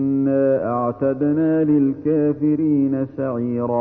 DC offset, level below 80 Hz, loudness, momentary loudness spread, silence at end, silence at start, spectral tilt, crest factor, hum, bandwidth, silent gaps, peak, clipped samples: under 0.1%; -56 dBFS; -19 LUFS; 5 LU; 0 s; 0 s; -13 dB/octave; 10 dB; none; 2.9 kHz; none; -8 dBFS; under 0.1%